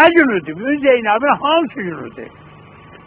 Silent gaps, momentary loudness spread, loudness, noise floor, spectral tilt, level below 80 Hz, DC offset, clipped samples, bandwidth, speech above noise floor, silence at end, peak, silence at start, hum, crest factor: none; 18 LU; -15 LUFS; -40 dBFS; -8.5 dB/octave; -54 dBFS; under 0.1%; under 0.1%; 4 kHz; 25 dB; 0.8 s; 0 dBFS; 0 s; none; 16 dB